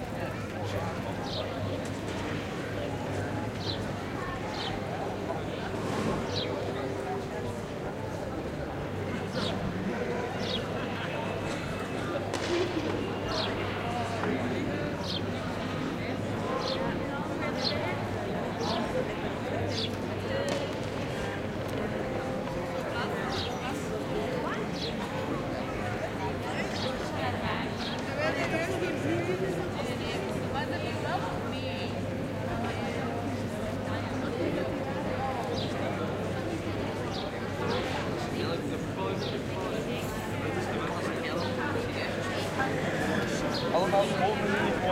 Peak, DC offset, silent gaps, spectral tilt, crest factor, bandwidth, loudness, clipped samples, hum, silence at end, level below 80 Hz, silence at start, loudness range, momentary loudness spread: -14 dBFS; under 0.1%; none; -5.5 dB/octave; 18 dB; 16 kHz; -32 LUFS; under 0.1%; none; 0 s; -50 dBFS; 0 s; 3 LU; 4 LU